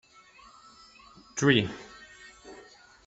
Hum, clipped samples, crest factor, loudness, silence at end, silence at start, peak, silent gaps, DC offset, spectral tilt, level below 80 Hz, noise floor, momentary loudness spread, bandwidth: none; under 0.1%; 26 dB; -26 LUFS; 0.5 s; 1.35 s; -6 dBFS; none; under 0.1%; -4.5 dB/octave; -64 dBFS; -55 dBFS; 25 LU; 8.2 kHz